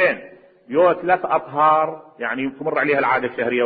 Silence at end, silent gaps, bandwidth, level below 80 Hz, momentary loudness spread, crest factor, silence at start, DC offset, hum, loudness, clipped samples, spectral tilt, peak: 0 s; none; 4.8 kHz; -62 dBFS; 9 LU; 16 dB; 0 s; under 0.1%; none; -19 LUFS; under 0.1%; -9.5 dB/octave; -4 dBFS